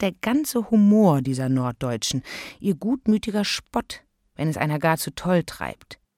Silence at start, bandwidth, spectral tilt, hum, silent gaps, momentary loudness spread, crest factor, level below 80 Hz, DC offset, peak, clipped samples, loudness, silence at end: 0 s; 16.5 kHz; -5.5 dB/octave; none; none; 15 LU; 16 dB; -52 dBFS; under 0.1%; -6 dBFS; under 0.1%; -23 LUFS; 0.25 s